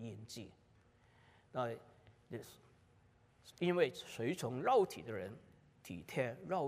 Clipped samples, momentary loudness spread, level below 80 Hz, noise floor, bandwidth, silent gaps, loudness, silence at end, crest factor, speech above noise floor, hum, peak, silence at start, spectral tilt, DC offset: under 0.1%; 18 LU; -78 dBFS; -69 dBFS; 15.5 kHz; none; -39 LUFS; 0 s; 22 dB; 30 dB; none; -20 dBFS; 0 s; -5.5 dB/octave; under 0.1%